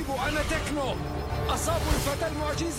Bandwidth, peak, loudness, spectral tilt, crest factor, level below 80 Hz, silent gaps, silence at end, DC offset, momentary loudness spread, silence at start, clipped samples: 16.5 kHz; -12 dBFS; -29 LUFS; -4.5 dB/octave; 16 dB; -34 dBFS; none; 0 s; under 0.1%; 4 LU; 0 s; under 0.1%